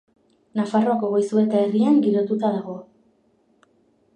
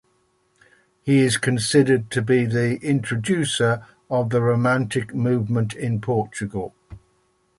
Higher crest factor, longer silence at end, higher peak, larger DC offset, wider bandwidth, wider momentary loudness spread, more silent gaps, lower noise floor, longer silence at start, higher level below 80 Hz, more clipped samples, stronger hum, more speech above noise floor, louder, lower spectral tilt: about the same, 14 dB vs 16 dB; first, 1.35 s vs 0.6 s; about the same, -8 dBFS vs -6 dBFS; neither; second, 9.6 kHz vs 11.5 kHz; about the same, 12 LU vs 10 LU; neither; about the same, -62 dBFS vs -65 dBFS; second, 0.55 s vs 1.05 s; second, -74 dBFS vs -54 dBFS; neither; neither; about the same, 43 dB vs 44 dB; about the same, -21 LUFS vs -21 LUFS; first, -8 dB/octave vs -5.5 dB/octave